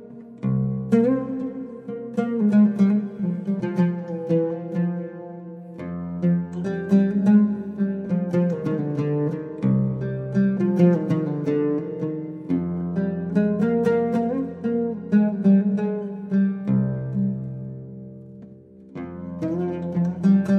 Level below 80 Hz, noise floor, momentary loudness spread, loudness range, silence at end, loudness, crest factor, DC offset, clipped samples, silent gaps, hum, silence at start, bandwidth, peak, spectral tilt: -58 dBFS; -45 dBFS; 15 LU; 5 LU; 0 s; -23 LUFS; 16 dB; under 0.1%; under 0.1%; none; none; 0 s; 6.2 kHz; -6 dBFS; -10.5 dB/octave